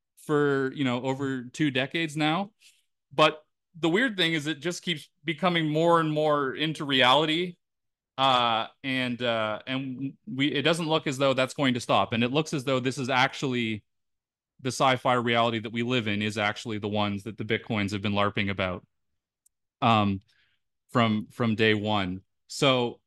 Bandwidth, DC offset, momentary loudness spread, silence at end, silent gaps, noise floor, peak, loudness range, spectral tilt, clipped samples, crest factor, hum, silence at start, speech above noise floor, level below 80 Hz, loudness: 12.5 kHz; under 0.1%; 9 LU; 0.1 s; none; -86 dBFS; -6 dBFS; 4 LU; -5 dB/octave; under 0.1%; 20 dB; none; 0.3 s; 59 dB; -68 dBFS; -26 LUFS